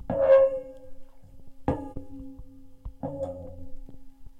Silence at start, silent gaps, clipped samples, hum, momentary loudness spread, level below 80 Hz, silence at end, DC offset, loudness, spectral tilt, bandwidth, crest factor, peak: 0 s; none; under 0.1%; none; 28 LU; -46 dBFS; 0 s; under 0.1%; -26 LUFS; -9 dB/octave; 3.9 kHz; 20 dB; -10 dBFS